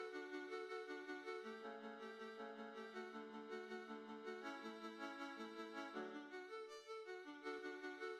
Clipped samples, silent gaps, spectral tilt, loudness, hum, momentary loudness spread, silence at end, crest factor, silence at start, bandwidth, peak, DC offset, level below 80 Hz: under 0.1%; none; -4 dB/octave; -52 LUFS; none; 4 LU; 0 s; 16 dB; 0 s; 13.5 kHz; -36 dBFS; under 0.1%; under -90 dBFS